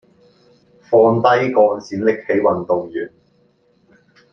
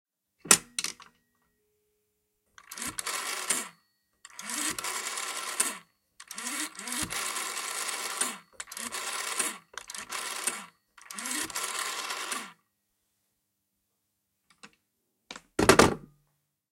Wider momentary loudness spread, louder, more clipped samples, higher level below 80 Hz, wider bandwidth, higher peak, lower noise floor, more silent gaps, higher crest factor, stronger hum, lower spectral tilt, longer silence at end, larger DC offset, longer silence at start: second, 12 LU vs 20 LU; first, -16 LUFS vs -29 LUFS; neither; second, -62 dBFS vs -56 dBFS; second, 6.6 kHz vs 16.5 kHz; about the same, -2 dBFS vs 0 dBFS; second, -58 dBFS vs -80 dBFS; neither; second, 16 dB vs 34 dB; neither; first, -7 dB/octave vs -2 dB/octave; first, 1.25 s vs 0.65 s; neither; first, 0.9 s vs 0.45 s